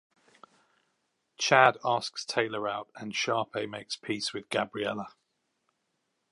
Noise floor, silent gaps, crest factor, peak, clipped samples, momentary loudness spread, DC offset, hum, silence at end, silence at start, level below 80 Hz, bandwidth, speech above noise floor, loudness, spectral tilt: -79 dBFS; none; 28 dB; -4 dBFS; under 0.1%; 15 LU; under 0.1%; none; 1.2 s; 1.4 s; -76 dBFS; 11.5 kHz; 50 dB; -29 LUFS; -3 dB/octave